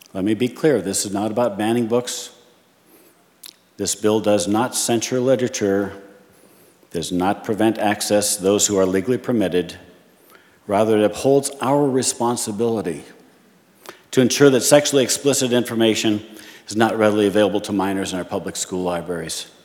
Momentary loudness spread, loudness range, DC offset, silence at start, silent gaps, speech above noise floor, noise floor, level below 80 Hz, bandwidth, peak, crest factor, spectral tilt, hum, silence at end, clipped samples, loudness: 10 LU; 5 LU; under 0.1%; 0.15 s; none; 35 dB; -54 dBFS; -60 dBFS; 18 kHz; 0 dBFS; 20 dB; -4 dB/octave; none; 0.15 s; under 0.1%; -19 LUFS